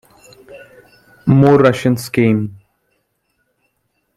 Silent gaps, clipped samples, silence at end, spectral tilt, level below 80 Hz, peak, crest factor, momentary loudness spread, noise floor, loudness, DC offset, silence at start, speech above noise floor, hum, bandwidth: none; under 0.1%; 1.65 s; -7.5 dB/octave; -50 dBFS; -2 dBFS; 16 dB; 11 LU; -67 dBFS; -13 LUFS; under 0.1%; 0.5 s; 55 dB; none; 14 kHz